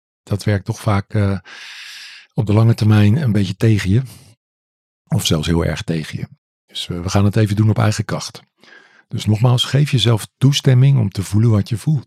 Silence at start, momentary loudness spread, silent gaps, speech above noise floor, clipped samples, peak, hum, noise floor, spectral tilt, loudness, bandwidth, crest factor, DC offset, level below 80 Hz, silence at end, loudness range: 0.3 s; 17 LU; 4.37-5.05 s, 6.38-6.68 s; 21 dB; under 0.1%; -2 dBFS; none; -37 dBFS; -6 dB/octave; -17 LUFS; 14.5 kHz; 16 dB; under 0.1%; -48 dBFS; 0.05 s; 4 LU